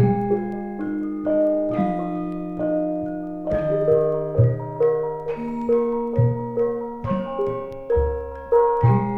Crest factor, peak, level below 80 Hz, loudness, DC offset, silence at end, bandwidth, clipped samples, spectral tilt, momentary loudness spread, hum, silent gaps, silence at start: 16 dB; -6 dBFS; -40 dBFS; -23 LUFS; under 0.1%; 0 s; 4 kHz; under 0.1%; -11 dB/octave; 9 LU; none; none; 0 s